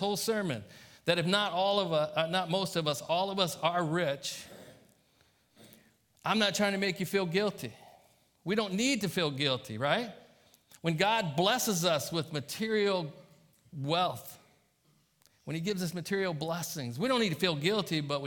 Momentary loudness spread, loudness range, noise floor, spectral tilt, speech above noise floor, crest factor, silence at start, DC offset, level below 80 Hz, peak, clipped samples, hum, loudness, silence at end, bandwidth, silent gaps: 12 LU; 5 LU; -70 dBFS; -4 dB/octave; 39 dB; 20 dB; 0 s; under 0.1%; -72 dBFS; -12 dBFS; under 0.1%; none; -31 LUFS; 0 s; 18 kHz; none